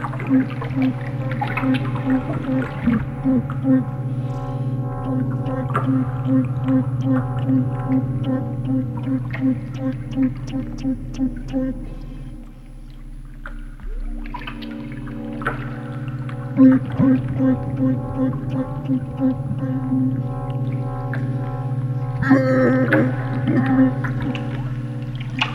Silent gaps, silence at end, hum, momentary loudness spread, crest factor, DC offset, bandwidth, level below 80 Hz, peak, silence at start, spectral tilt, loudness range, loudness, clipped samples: none; 0 s; none; 14 LU; 20 dB; under 0.1%; 6.2 kHz; -38 dBFS; -2 dBFS; 0 s; -9 dB/octave; 11 LU; -21 LUFS; under 0.1%